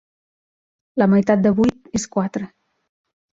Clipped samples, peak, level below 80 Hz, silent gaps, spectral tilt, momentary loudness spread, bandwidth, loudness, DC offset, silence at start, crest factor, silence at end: under 0.1%; -4 dBFS; -52 dBFS; none; -6.5 dB/octave; 14 LU; 7.8 kHz; -19 LUFS; under 0.1%; 0.95 s; 18 dB; 0.85 s